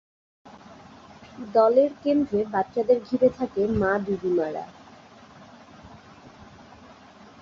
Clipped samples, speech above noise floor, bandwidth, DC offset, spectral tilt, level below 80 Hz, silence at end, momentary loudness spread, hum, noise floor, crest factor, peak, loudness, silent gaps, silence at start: under 0.1%; 26 dB; 7.2 kHz; under 0.1%; -8 dB/octave; -54 dBFS; 0.95 s; 14 LU; none; -49 dBFS; 18 dB; -8 dBFS; -23 LUFS; none; 0.45 s